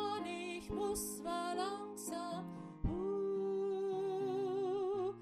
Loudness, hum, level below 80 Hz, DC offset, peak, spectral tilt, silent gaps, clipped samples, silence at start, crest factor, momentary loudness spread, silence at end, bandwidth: -40 LUFS; none; -56 dBFS; under 0.1%; -24 dBFS; -5 dB/octave; none; under 0.1%; 0 s; 14 dB; 6 LU; 0 s; 14 kHz